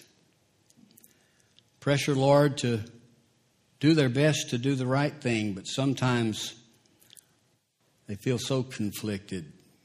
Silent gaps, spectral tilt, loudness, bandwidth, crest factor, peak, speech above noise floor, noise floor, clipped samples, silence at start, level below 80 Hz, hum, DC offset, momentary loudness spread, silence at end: none; -5.5 dB/octave; -27 LUFS; 15.5 kHz; 20 dB; -10 dBFS; 44 dB; -70 dBFS; under 0.1%; 1.8 s; -66 dBFS; none; under 0.1%; 13 LU; 0.35 s